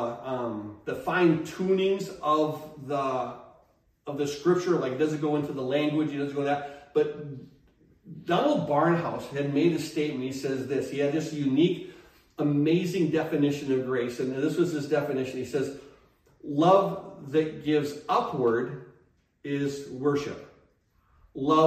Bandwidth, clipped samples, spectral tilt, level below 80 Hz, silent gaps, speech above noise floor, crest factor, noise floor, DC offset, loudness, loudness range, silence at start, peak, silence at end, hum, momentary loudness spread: 15 kHz; under 0.1%; -6.5 dB/octave; -66 dBFS; none; 39 dB; 20 dB; -66 dBFS; under 0.1%; -27 LUFS; 3 LU; 0 s; -8 dBFS; 0 s; none; 13 LU